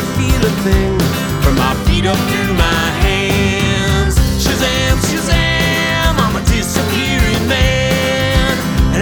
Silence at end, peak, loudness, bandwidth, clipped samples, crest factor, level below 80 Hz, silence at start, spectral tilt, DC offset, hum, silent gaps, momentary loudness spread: 0 s; 0 dBFS; -14 LUFS; over 20 kHz; under 0.1%; 14 dB; -20 dBFS; 0 s; -4.5 dB/octave; under 0.1%; none; none; 2 LU